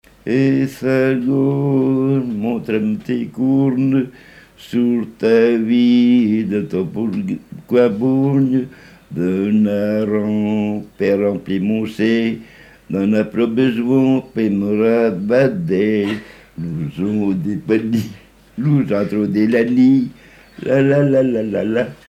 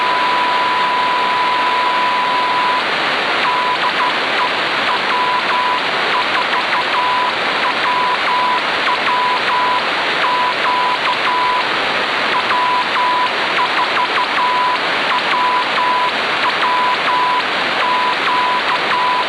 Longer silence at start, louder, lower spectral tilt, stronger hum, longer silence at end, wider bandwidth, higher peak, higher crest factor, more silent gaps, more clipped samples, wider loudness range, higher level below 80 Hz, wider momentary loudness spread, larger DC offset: first, 0.25 s vs 0 s; about the same, -17 LUFS vs -15 LUFS; first, -8.5 dB/octave vs -2.5 dB/octave; neither; first, 0.15 s vs 0 s; first, 13 kHz vs 11 kHz; about the same, -2 dBFS vs -4 dBFS; about the same, 14 dB vs 12 dB; neither; neither; first, 3 LU vs 0 LU; about the same, -54 dBFS vs -58 dBFS; first, 9 LU vs 1 LU; neither